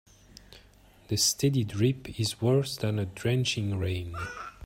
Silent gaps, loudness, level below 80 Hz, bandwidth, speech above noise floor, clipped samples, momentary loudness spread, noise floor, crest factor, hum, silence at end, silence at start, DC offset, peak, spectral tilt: none; -28 LUFS; -56 dBFS; 16 kHz; 29 dB; under 0.1%; 9 LU; -57 dBFS; 18 dB; none; 0 s; 0.5 s; under 0.1%; -12 dBFS; -4.5 dB/octave